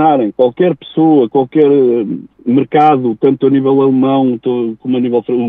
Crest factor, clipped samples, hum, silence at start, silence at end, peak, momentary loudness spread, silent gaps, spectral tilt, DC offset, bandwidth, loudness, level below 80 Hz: 10 dB; under 0.1%; none; 0 s; 0 s; 0 dBFS; 7 LU; none; -10 dB/octave; under 0.1%; 3.9 kHz; -12 LUFS; -60 dBFS